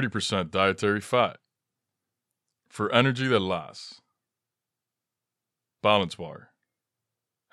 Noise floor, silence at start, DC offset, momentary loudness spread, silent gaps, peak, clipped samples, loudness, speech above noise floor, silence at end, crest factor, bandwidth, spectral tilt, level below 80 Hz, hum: -88 dBFS; 0 s; under 0.1%; 18 LU; none; -4 dBFS; under 0.1%; -25 LUFS; 62 dB; 1.15 s; 26 dB; 13 kHz; -5 dB/octave; -68 dBFS; none